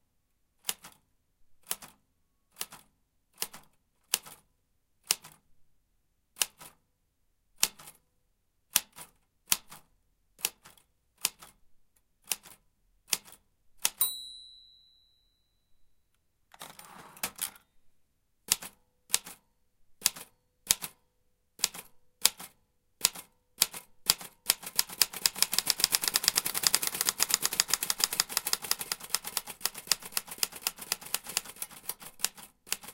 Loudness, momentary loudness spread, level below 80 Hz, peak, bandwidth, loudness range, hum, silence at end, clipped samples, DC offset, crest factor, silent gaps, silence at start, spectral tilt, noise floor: -30 LUFS; 18 LU; -66 dBFS; -2 dBFS; 17 kHz; 13 LU; none; 0 s; under 0.1%; under 0.1%; 34 dB; none; 0.65 s; 1.5 dB/octave; -74 dBFS